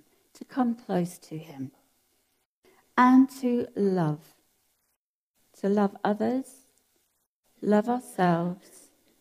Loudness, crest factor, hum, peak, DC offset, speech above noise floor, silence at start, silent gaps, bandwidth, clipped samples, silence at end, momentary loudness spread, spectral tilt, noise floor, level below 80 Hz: -26 LUFS; 22 dB; none; -8 dBFS; under 0.1%; 54 dB; 0.5 s; 2.45-2.62 s, 4.96-5.34 s, 7.27-7.43 s; 15 kHz; under 0.1%; 0.65 s; 20 LU; -7.5 dB/octave; -80 dBFS; -78 dBFS